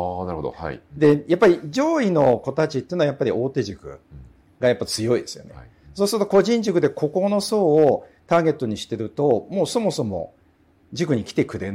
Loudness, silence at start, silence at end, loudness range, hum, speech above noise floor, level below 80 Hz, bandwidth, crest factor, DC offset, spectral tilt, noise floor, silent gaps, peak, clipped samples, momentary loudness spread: -21 LUFS; 0 s; 0 s; 4 LU; none; 37 dB; -54 dBFS; 16 kHz; 14 dB; under 0.1%; -6 dB/octave; -57 dBFS; none; -6 dBFS; under 0.1%; 13 LU